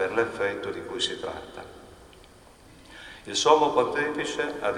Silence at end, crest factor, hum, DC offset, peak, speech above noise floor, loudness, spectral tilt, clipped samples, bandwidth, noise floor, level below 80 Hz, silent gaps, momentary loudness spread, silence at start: 0 s; 24 dB; none; under 0.1%; -4 dBFS; 26 dB; -26 LUFS; -2.5 dB/octave; under 0.1%; 12 kHz; -52 dBFS; -58 dBFS; none; 23 LU; 0 s